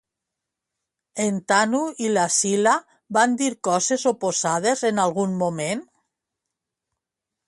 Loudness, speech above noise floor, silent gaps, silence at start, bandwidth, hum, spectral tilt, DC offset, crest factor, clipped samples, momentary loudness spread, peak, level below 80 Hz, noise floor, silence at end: -22 LUFS; 64 dB; none; 1.15 s; 11.5 kHz; none; -3.5 dB/octave; under 0.1%; 20 dB; under 0.1%; 6 LU; -4 dBFS; -70 dBFS; -85 dBFS; 1.65 s